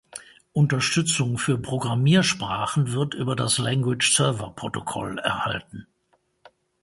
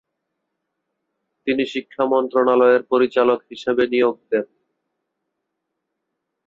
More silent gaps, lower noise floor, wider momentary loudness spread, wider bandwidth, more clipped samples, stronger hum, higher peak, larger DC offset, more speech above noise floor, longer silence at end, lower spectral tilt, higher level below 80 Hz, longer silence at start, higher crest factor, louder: neither; second, -68 dBFS vs -78 dBFS; first, 12 LU vs 9 LU; first, 11.5 kHz vs 7.4 kHz; neither; neither; about the same, -6 dBFS vs -4 dBFS; neither; second, 45 dB vs 60 dB; second, 1 s vs 2 s; second, -4 dB/octave vs -5.5 dB/octave; first, -56 dBFS vs -66 dBFS; second, 0.15 s vs 1.45 s; about the same, 18 dB vs 18 dB; second, -23 LUFS vs -19 LUFS